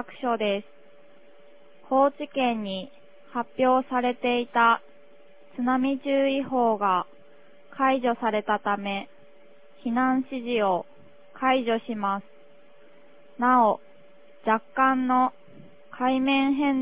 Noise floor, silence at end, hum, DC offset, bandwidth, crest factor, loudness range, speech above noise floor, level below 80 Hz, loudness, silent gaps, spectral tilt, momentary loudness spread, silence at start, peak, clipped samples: -55 dBFS; 0 s; none; 0.4%; 4 kHz; 18 dB; 3 LU; 31 dB; -68 dBFS; -25 LUFS; none; -8.5 dB/octave; 12 LU; 0 s; -8 dBFS; under 0.1%